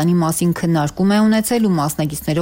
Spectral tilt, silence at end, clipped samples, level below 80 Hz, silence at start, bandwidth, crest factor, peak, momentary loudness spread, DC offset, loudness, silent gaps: -6 dB/octave; 0 s; under 0.1%; -46 dBFS; 0 s; 17 kHz; 8 dB; -8 dBFS; 5 LU; under 0.1%; -17 LUFS; none